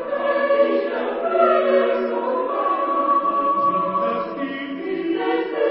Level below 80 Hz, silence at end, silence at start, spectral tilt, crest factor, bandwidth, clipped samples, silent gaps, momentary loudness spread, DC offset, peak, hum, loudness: -66 dBFS; 0 s; 0 s; -10 dB/octave; 16 dB; 5.6 kHz; under 0.1%; none; 8 LU; under 0.1%; -4 dBFS; none; -20 LUFS